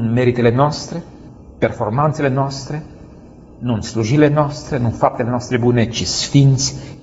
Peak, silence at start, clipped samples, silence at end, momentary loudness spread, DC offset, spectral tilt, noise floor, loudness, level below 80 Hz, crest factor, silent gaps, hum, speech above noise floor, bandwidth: 0 dBFS; 0 s; under 0.1%; 0 s; 13 LU; under 0.1%; -5.5 dB/octave; -40 dBFS; -17 LUFS; -42 dBFS; 16 dB; none; none; 24 dB; 8 kHz